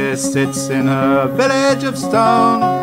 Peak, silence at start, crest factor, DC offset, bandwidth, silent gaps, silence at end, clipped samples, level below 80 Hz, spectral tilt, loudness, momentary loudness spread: -2 dBFS; 0 s; 12 dB; 0.2%; 16 kHz; none; 0 s; under 0.1%; -56 dBFS; -5 dB/octave; -15 LUFS; 5 LU